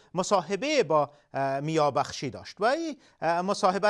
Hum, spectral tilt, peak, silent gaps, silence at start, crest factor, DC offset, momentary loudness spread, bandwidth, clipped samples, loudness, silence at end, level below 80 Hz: none; -4.5 dB/octave; -10 dBFS; none; 0.15 s; 18 dB; under 0.1%; 8 LU; 11.5 kHz; under 0.1%; -28 LUFS; 0 s; -70 dBFS